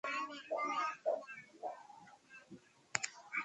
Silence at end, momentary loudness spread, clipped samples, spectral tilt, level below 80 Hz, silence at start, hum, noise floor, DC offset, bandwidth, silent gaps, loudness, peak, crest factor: 0 s; 20 LU; under 0.1%; -1.5 dB/octave; -86 dBFS; 0.05 s; none; -60 dBFS; under 0.1%; 10.5 kHz; none; -41 LUFS; -12 dBFS; 30 dB